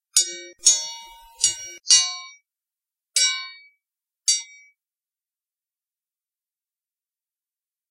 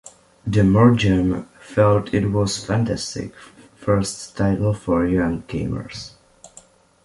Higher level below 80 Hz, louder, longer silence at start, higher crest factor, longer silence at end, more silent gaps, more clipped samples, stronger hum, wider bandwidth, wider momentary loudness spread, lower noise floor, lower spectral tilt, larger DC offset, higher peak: second, -70 dBFS vs -40 dBFS; about the same, -19 LUFS vs -20 LUFS; about the same, 0.15 s vs 0.05 s; first, 26 dB vs 18 dB; first, 3.45 s vs 0.6 s; neither; neither; neither; first, 16 kHz vs 11.5 kHz; about the same, 17 LU vs 16 LU; first, under -90 dBFS vs -50 dBFS; second, 4 dB/octave vs -6.5 dB/octave; neither; about the same, 0 dBFS vs -2 dBFS